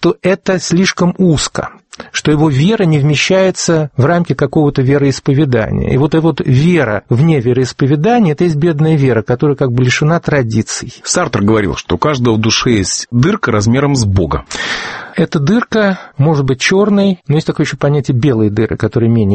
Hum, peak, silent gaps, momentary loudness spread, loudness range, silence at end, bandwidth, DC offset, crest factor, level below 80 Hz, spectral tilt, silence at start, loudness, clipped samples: none; 0 dBFS; none; 5 LU; 2 LU; 0 s; 8.8 kHz; under 0.1%; 12 dB; -36 dBFS; -5.5 dB/octave; 0 s; -12 LUFS; under 0.1%